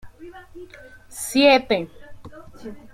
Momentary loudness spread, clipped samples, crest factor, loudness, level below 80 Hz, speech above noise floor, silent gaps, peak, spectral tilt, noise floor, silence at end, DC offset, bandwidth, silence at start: 27 LU; under 0.1%; 22 dB; -19 LUFS; -52 dBFS; 17 dB; none; -2 dBFS; -3 dB/octave; -39 dBFS; 0.15 s; under 0.1%; 16 kHz; 0.05 s